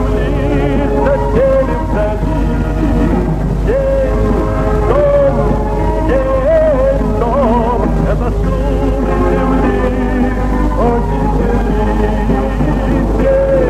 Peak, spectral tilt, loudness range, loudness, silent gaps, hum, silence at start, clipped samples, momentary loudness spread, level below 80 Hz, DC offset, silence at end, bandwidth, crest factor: 0 dBFS; -8.5 dB/octave; 2 LU; -14 LUFS; none; 50 Hz at -15 dBFS; 0 s; under 0.1%; 4 LU; -16 dBFS; under 0.1%; 0 s; 8.8 kHz; 12 dB